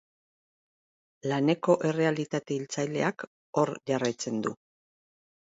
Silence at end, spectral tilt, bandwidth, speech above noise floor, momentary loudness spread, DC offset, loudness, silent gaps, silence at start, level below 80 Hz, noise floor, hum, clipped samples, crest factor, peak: 0.9 s; -5.5 dB/octave; 8 kHz; over 62 dB; 9 LU; under 0.1%; -29 LUFS; 3.27-3.53 s; 1.25 s; -76 dBFS; under -90 dBFS; none; under 0.1%; 20 dB; -10 dBFS